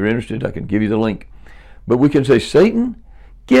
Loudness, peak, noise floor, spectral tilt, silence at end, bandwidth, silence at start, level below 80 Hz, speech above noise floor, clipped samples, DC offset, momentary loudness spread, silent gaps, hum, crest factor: -16 LUFS; -4 dBFS; -38 dBFS; -7 dB/octave; 0 s; 11.5 kHz; 0 s; -40 dBFS; 23 dB; under 0.1%; under 0.1%; 11 LU; none; none; 14 dB